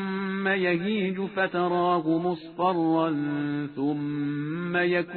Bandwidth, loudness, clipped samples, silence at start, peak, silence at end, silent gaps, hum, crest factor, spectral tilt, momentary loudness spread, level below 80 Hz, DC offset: 4.5 kHz; -26 LUFS; under 0.1%; 0 s; -12 dBFS; 0 s; none; none; 16 dB; -10 dB/octave; 6 LU; -66 dBFS; under 0.1%